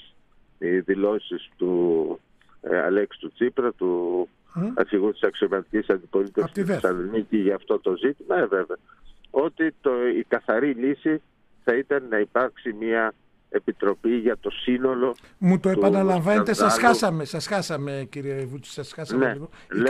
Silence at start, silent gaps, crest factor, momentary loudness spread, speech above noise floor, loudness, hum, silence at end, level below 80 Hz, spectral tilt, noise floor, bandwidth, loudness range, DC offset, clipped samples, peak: 0.6 s; none; 20 dB; 11 LU; 33 dB; -24 LUFS; none; 0 s; -58 dBFS; -6 dB/octave; -56 dBFS; 13.5 kHz; 4 LU; under 0.1%; under 0.1%; -4 dBFS